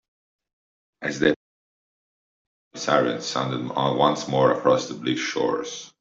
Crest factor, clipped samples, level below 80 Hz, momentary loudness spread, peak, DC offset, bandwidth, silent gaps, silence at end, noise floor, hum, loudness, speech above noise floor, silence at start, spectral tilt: 22 dB; under 0.1%; -62 dBFS; 11 LU; -4 dBFS; under 0.1%; 7.8 kHz; 1.36-2.71 s; 0.15 s; under -90 dBFS; none; -23 LUFS; over 67 dB; 1 s; -4.5 dB/octave